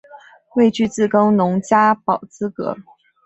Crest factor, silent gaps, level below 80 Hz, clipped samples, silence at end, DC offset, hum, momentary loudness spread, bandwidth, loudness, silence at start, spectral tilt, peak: 16 dB; none; -58 dBFS; under 0.1%; 0.45 s; under 0.1%; none; 12 LU; 8.2 kHz; -17 LUFS; 0.15 s; -6.5 dB/octave; -2 dBFS